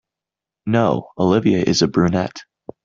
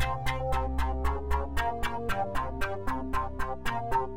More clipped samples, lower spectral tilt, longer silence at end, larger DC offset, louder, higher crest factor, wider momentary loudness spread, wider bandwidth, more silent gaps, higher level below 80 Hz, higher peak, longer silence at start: neither; about the same, -6 dB/octave vs -5.5 dB/octave; first, 0.4 s vs 0 s; neither; first, -18 LUFS vs -32 LUFS; about the same, 16 dB vs 14 dB; first, 12 LU vs 3 LU; second, 7.6 kHz vs 16.5 kHz; neither; second, -52 dBFS vs -36 dBFS; first, -2 dBFS vs -14 dBFS; first, 0.65 s vs 0 s